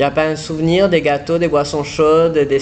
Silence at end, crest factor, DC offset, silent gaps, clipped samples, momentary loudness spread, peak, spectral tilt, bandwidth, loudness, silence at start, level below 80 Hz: 0 s; 12 dB; under 0.1%; none; under 0.1%; 6 LU; -2 dBFS; -6 dB/octave; 9 kHz; -15 LUFS; 0 s; -42 dBFS